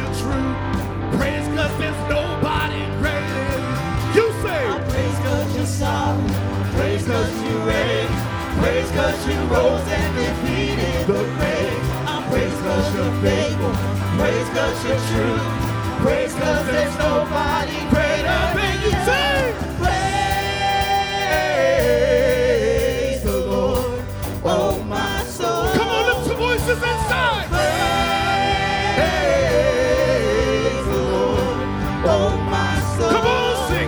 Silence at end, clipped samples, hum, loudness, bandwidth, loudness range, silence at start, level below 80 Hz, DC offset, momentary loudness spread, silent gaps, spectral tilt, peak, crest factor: 0 s; under 0.1%; none; -20 LUFS; over 20 kHz; 3 LU; 0 s; -32 dBFS; under 0.1%; 5 LU; none; -5.5 dB/octave; 0 dBFS; 18 dB